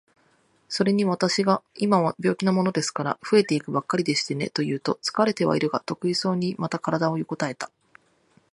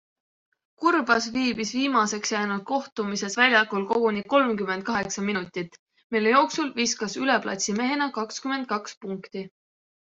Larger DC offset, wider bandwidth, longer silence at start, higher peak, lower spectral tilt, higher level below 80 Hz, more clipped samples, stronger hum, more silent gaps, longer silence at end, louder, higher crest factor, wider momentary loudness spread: neither; first, 11.5 kHz vs 8.2 kHz; about the same, 0.7 s vs 0.8 s; about the same, -6 dBFS vs -6 dBFS; first, -5 dB/octave vs -3 dB/octave; about the same, -68 dBFS vs -66 dBFS; neither; neither; second, none vs 2.92-2.96 s, 5.79-5.87 s, 6.04-6.10 s, 8.97-9.01 s; first, 0.85 s vs 0.55 s; about the same, -24 LUFS vs -24 LUFS; about the same, 20 dB vs 20 dB; second, 7 LU vs 14 LU